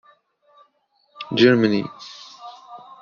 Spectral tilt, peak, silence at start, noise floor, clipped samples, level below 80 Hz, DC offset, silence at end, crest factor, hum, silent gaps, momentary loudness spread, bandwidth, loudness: -4.5 dB/octave; -2 dBFS; 1.2 s; -65 dBFS; under 0.1%; -64 dBFS; under 0.1%; 0.25 s; 20 dB; none; none; 26 LU; 7 kHz; -18 LUFS